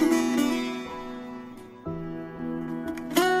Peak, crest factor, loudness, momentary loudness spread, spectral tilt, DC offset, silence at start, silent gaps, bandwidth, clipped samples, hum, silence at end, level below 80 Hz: -8 dBFS; 20 dB; -29 LUFS; 16 LU; -4.5 dB/octave; under 0.1%; 0 s; none; 16 kHz; under 0.1%; none; 0 s; -56 dBFS